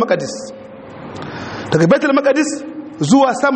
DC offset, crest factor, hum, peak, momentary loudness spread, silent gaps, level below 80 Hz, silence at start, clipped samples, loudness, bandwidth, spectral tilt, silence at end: under 0.1%; 16 dB; none; 0 dBFS; 20 LU; none; -54 dBFS; 0 s; under 0.1%; -15 LUFS; 8.8 kHz; -5.5 dB/octave; 0 s